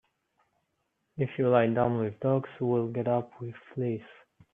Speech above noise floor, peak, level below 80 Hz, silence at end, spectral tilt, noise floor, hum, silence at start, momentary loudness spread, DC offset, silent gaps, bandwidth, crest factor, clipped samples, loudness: 50 dB; -8 dBFS; -68 dBFS; 0.4 s; -10.5 dB/octave; -78 dBFS; none; 1.15 s; 15 LU; under 0.1%; none; 3.8 kHz; 22 dB; under 0.1%; -29 LUFS